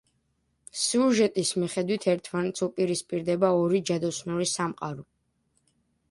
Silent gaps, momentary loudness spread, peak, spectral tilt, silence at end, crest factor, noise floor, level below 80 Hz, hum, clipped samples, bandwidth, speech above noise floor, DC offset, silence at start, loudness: none; 8 LU; -10 dBFS; -4.5 dB/octave; 1.1 s; 18 dB; -73 dBFS; -68 dBFS; none; under 0.1%; 11.5 kHz; 47 dB; under 0.1%; 0.75 s; -27 LUFS